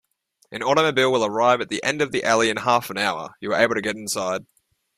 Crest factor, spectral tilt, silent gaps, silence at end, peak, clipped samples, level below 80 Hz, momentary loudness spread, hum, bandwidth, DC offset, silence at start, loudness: 20 dB; -3.5 dB/octave; none; 0.55 s; -4 dBFS; under 0.1%; -62 dBFS; 9 LU; none; 15.5 kHz; under 0.1%; 0.5 s; -21 LUFS